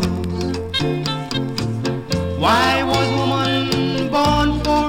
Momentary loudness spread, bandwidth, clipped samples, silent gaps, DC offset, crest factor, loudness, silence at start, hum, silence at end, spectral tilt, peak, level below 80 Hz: 7 LU; 17 kHz; under 0.1%; none; under 0.1%; 14 dB; -19 LUFS; 0 s; none; 0 s; -5.5 dB/octave; -4 dBFS; -34 dBFS